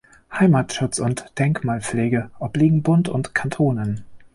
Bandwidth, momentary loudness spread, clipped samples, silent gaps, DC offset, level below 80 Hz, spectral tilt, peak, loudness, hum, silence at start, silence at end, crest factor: 11.5 kHz; 9 LU; under 0.1%; none; under 0.1%; -50 dBFS; -6.5 dB/octave; -4 dBFS; -21 LUFS; none; 0.3 s; 0.1 s; 16 dB